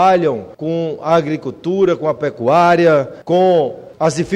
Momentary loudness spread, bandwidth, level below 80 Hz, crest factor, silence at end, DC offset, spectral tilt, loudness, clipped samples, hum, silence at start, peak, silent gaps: 11 LU; 11 kHz; -54 dBFS; 14 dB; 0 s; under 0.1%; -6.5 dB/octave; -15 LUFS; under 0.1%; none; 0 s; -2 dBFS; none